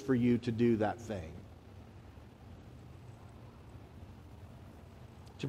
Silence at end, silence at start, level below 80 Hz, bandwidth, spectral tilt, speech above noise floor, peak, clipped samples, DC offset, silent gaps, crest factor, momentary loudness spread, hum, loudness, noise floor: 0 s; 0 s; -60 dBFS; 10 kHz; -8 dB/octave; 22 dB; -18 dBFS; under 0.1%; under 0.1%; none; 18 dB; 24 LU; none; -33 LUFS; -53 dBFS